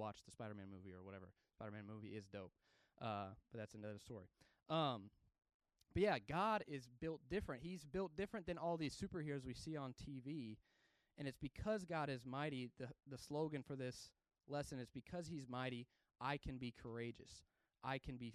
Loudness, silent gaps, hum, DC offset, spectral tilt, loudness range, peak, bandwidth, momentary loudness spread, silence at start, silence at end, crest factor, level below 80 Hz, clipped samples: -48 LUFS; 5.54-5.60 s; none; under 0.1%; -6 dB/octave; 9 LU; -28 dBFS; 13.5 kHz; 15 LU; 0 s; 0 s; 22 dB; -68 dBFS; under 0.1%